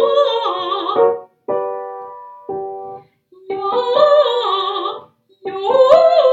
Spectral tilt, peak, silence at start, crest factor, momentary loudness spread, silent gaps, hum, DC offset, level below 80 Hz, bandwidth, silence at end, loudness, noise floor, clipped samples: -4 dB/octave; 0 dBFS; 0 s; 16 dB; 21 LU; none; none; under 0.1%; -66 dBFS; 7.8 kHz; 0 s; -16 LUFS; -46 dBFS; under 0.1%